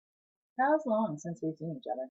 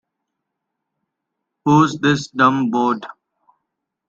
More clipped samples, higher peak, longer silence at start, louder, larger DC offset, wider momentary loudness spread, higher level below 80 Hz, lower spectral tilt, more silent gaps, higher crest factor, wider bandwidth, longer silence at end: neither; second, -16 dBFS vs -2 dBFS; second, 0.6 s vs 1.65 s; second, -33 LUFS vs -17 LUFS; neither; about the same, 11 LU vs 11 LU; second, -82 dBFS vs -60 dBFS; about the same, -7 dB/octave vs -6 dB/octave; neither; about the same, 18 dB vs 18 dB; about the same, 8 kHz vs 7.8 kHz; second, 0 s vs 1 s